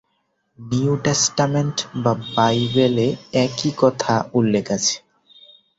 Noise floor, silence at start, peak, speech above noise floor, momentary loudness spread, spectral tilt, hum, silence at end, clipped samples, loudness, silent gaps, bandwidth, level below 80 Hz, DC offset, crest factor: -69 dBFS; 0.6 s; -2 dBFS; 50 dB; 5 LU; -4.5 dB/octave; none; 0.8 s; under 0.1%; -19 LUFS; none; 8 kHz; -54 dBFS; under 0.1%; 18 dB